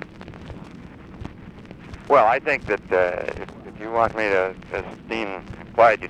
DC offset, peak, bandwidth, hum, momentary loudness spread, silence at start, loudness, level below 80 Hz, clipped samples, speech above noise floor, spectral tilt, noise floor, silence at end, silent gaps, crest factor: under 0.1%; -4 dBFS; 9.4 kHz; none; 23 LU; 0 s; -22 LUFS; -48 dBFS; under 0.1%; 20 dB; -6 dB/octave; -41 dBFS; 0 s; none; 20 dB